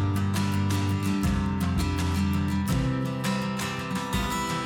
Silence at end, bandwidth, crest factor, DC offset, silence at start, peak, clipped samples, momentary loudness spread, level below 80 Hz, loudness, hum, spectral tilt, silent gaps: 0 s; 19 kHz; 10 dB; under 0.1%; 0 s; -16 dBFS; under 0.1%; 3 LU; -38 dBFS; -27 LUFS; none; -5.5 dB/octave; none